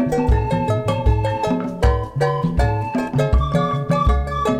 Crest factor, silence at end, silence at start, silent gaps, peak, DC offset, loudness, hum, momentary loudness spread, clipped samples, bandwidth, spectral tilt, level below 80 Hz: 12 dB; 0 s; 0 s; none; -6 dBFS; under 0.1%; -19 LUFS; none; 3 LU; under 0.1%; 11 kHz; -7.5 dB/octave; -24 dBFS